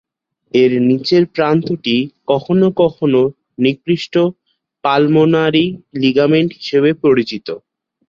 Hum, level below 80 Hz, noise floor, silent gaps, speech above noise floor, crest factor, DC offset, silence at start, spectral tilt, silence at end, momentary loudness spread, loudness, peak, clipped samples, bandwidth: none; -56 dBFS; -53 dBFS; none; 39 dB; 14 dB; under 0.1%; 0.55 s; -7.5 dB/octave; 0.5 s; 7 LU; -14 LUFS; -2 dBFS; under 0.1%; 7.2 kHz